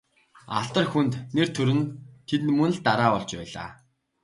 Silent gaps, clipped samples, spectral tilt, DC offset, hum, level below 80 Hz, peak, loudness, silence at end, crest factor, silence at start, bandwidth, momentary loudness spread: none; under 0.1%; -6 dB/octave; under 0.1%; none; -60 dBFS; -6 dBFS; -25 LUFS; 0.5 s; 20 dB; 0.5 s; 11.5 kHz; 14 LU